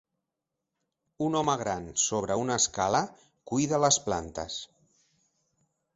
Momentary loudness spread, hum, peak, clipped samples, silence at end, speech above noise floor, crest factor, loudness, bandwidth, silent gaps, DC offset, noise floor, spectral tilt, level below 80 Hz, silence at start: 12 LU; none; -10 dBFS; under 0.1%; 1.3 s; 58 dB; 22 dB; -28 LUFS; 8.2 kHz; none; under 0.1%; -86 dBFS; -3 dB/octave; -58 dBFS; 1.2 s